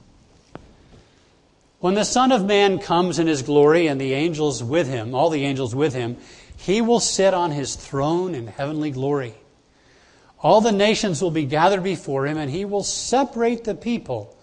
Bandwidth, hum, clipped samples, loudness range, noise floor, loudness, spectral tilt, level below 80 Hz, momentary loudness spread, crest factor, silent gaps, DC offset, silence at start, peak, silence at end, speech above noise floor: 11 kHz; none; under 0.1%; 4 LU; -58 dBFS; -20 LUFS; -4.5 dB/octave; -52 dBFS; 10 LU; 18 dB; none; under 0.1%; 1.85 s; -2 dBFS; 0.15 s; 38 dB